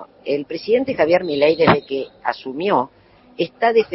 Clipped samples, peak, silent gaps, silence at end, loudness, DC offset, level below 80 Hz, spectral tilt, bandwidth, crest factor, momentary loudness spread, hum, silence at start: under 0.1%; -2 dBFS; none; 0 s; -19 LUFS; under 0.1%; -56 dBFS; -9 dB/octave; 5.8 kHz; 18 dB; 11 LU; none; 0 s